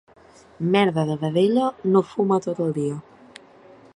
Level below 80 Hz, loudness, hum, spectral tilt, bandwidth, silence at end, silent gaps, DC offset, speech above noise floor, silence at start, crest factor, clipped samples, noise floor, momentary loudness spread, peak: -64 dBFS; -22 LUFS; none; -7.5 dB/octave; 11 kHz; 0.95 s; none; under 0.1%; 28 dB; 0.6 s; 18 dB; under 0.1%; -49 dBFS; 8 LU; -6 dBFS